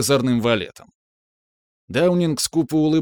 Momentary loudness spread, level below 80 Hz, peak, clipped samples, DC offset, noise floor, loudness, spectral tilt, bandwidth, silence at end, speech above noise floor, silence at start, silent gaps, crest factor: 6 LU; -54 dBFS; -4 dBFS; under 0.1%; under 0.1%; under -90 dBFS; -20 LUFS; -5 dB/octave; over 20 kHz; 0 s; over 71 dB; 0 s; 0.95-1.88 s; 16 dB